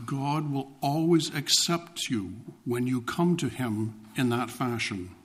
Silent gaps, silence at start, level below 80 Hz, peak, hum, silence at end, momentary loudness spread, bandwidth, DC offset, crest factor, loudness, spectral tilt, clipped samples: none; 0 s; -64 dBFS; -10 dBFS; none; 0.1 s; 10 LU; 15.5 kHz; under 0.1%; 20 dB; -28 LUFS; -4.5 dB/octave; under 0.1%